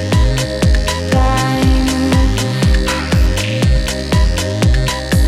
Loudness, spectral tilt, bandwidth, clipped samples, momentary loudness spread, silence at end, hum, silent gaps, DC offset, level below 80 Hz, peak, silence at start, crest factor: -14 LUFS; -5.5 dB/octave; 16 kHz; under 0.1%; 2 LU; 0 s; none; none; under 0.1%; -16 dBFS; -2 dBFS; 0 s; 10 dB